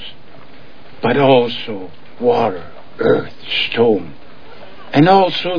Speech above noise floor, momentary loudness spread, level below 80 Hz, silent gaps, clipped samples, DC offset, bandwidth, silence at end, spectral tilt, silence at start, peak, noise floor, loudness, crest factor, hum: 28 dB; 19 LU; -54 dBFS; none; under 0.1%; 4%; 5.4 kHz; 0 s; -7.5 dB/octave; 0 s; 0 dBFS; -42 dBFS; -15 LUFS; 16 dB; none